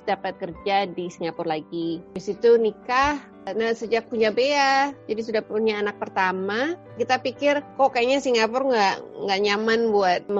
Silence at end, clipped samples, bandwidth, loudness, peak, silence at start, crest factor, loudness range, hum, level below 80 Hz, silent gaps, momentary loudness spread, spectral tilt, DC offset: 0 s; under 0.1%; 7.8 kHz; -23 LUFS; -6 dBFS; 0.05 s; 18 dB; 2 LU; none; -56 dBFS; none; 10 LU; -4 dB/octave; under 0.1%